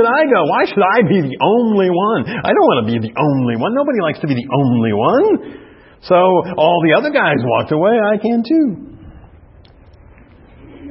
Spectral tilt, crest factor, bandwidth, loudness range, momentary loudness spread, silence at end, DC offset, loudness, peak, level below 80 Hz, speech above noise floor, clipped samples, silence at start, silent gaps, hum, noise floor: -11 dB/octave; 14 dB; 5.8 kHz; 3 LU; 6 LU; 0 s; under 0.1%; -14 LUFS; 0 dBFS; -50 dBFS; 29 dB; under 0.1%; 0 s; none; none; -43 dBFS